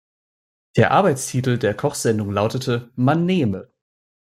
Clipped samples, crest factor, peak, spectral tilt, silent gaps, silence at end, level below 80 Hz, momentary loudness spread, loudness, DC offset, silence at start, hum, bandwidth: under 0.1%; 20 dB; -2 dBFS; -6 dB/octave; none; 0.75 s; -58 dBFS; 8 LU; -20 LUFS; under 0.1%; 0.75 s; none; 15.5 kHz